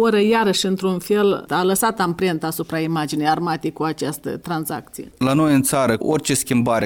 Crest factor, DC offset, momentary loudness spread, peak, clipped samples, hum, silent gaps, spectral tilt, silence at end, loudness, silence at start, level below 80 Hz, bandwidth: 14 dB; under 0.1%; 9 LU; -6 dBFS; under 0.1%; none; none; -4.5 dB/octave; 0 s; -20 LUFS; 0 s; -52 dBFS; 19 kHz